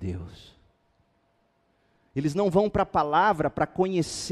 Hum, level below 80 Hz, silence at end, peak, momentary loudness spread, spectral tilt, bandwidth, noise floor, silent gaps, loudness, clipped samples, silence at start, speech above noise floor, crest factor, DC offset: none; -52 dBFS; 0 s; -8 dBFS; 13 LU; -5.5 dB/octave; 13.5 kHz; -69 dBFS; none; -25 LUFS; under 0.1%; 0 s; 44 dB; 20 dB; under 0.1%